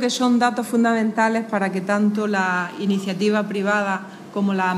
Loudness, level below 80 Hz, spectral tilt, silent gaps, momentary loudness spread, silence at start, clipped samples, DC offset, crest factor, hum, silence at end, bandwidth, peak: -21 LUFS; -74 dBFS; -5.5 dB/octave; none; 5 LU; 0 s; under 0.1%; under 0.1%; 16 dB; none; 0 s; 13 kHz; -4 dBFS